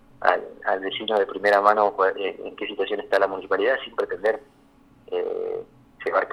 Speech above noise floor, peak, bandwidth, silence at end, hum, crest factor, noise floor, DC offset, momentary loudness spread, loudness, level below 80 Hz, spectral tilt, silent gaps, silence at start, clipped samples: 31 dB; -2 dBFS; 13 kHz; 0 s; none; 22 dB; -55 dBFS; under 0.1%; 13 LU; -24 LUFS; -62 dBFS; -4.5 dB/octave; none; 0.2 s; under 0.1%